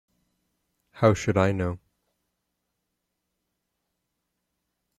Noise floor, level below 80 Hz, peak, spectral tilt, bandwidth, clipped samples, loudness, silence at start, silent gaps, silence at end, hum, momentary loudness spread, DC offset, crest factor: -81 dBFS; -58 dBFS; -6 dBFS; -7 dB/octave; 12 kHz; under 0.1%; -24 LUFS; 0.95 s; none; 3.2 s; none; 10 LU; under 0.1%; 24 dB